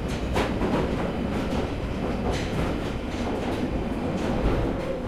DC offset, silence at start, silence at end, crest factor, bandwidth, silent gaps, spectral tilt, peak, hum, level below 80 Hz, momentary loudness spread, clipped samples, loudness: under 0.1%; 0 s; 0 s; 14 dB; 14.5 kHz; none; -6.5 dB/octave; -12 dBFS; none; -34 dBFS; 4 LU; under 0.1%; -27 LUFS